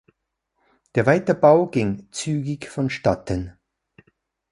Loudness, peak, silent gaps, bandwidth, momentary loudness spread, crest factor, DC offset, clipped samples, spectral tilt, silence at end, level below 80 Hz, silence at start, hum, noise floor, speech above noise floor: -21 LUFS; -2 dBFS; none; 11.5 kHz; 13 LU; 20 dB; under 0.1%; under 0.1%; -6.5 dB/octave; 1 s; -48 dBFS; 0.95 s; none; -76 dBFS; 56 dB